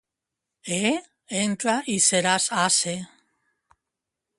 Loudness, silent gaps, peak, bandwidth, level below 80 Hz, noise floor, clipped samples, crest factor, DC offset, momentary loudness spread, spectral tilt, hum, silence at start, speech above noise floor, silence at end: -22 LUFS; none; -4 dBFS; 11.5 kHz; -68 dBFS; -85 dBFS; under 0.1%; 22 dB; under 0.1%; 13 LU; -2 dB/octave; none; 0.65 s; 62 dB; 1.35 s